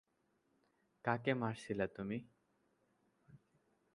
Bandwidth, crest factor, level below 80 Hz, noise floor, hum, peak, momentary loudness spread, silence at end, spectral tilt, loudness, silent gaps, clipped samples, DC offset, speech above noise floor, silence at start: 11 kHz; 26 dB; -74 dBFS; -80 dBFS; none; -18 dBFS; 8 LU; 0.6 s; -7 dB/octave; -41 LUFS; none; under 0.1%; under 0.1%; 41 dB; 1.05 s